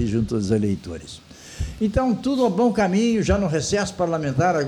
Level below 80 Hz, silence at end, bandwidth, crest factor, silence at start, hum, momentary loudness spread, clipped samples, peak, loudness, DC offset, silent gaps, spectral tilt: -38 dBFS; 0 s; 12 kHz; 16 dB; 0 s; none; 15 LU; under 0.1%; -6 dBFS; -21 LUFS; under 0.1%; none; -6 dB/octave